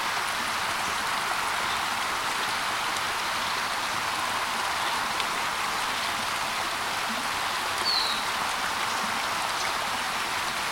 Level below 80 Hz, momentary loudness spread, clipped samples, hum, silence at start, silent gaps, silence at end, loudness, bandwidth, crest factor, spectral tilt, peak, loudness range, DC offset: -58 dBFS; 1 LU; under 0.1%; none; 0 s; none; 0 s; -27 LUFS; 16.5 kHz; 18 dB; -0.5 dB/octave; -10 dBFS; 1 LU; under 0.1%